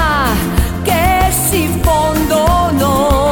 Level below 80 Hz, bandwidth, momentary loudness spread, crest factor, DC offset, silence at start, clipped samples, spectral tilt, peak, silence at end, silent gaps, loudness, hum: -20 dBFS; 19 kHz; 3 LU; 10 dB; under 0.1%; 0 s; under 0.1%; -4.5 dB/octave; -2 dBFS; 0 s; none; -13 LUFS; none